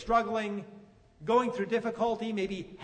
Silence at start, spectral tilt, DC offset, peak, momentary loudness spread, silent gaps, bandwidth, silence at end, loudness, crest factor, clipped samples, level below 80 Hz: 0 s; -6 dB/octave; under 0.1%; -14 dBFS; 12 LU; none; 9.4 kHz; 0 s; -31 LUFS; 18 dB; under 0.1%; -56 dBFS